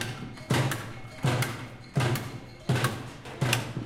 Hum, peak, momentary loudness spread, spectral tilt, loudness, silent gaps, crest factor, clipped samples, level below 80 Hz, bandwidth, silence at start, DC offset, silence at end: none; -8 dBFS; 12 LU; -5 dB/octave; -30 LUFS; none; 22 dB; under 0.1%; -54 dBFS; 16.5 kHz; 0 s; under 0.1%; 0 s